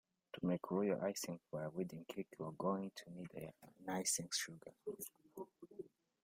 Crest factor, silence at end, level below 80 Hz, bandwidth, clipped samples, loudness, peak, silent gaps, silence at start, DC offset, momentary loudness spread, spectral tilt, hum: 20 dB; 0.35 s; -80 dBFS; 16 kHz; under 0.1%; -44 LUFS; -24 dBFS; none; 0.35 s; under 0.1%; 17 LU; -4 dB/octave; none